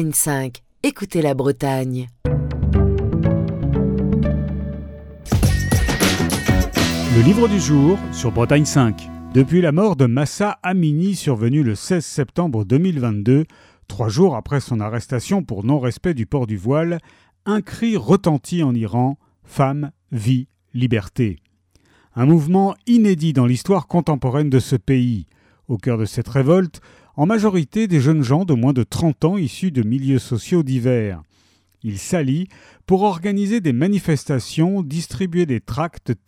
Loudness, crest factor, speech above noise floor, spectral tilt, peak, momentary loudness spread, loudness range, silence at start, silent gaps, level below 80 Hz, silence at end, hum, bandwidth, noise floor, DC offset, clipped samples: -19 LUFS; 16 dB; 41 dB; -6.5 dB/octave; -2 dBFS; 9 LU; 4 LU; 0 s; none; -34 dBFS; 0.1 s; none; 18.5 kHz; -58 dBFS; under 0.1%; under 0.1%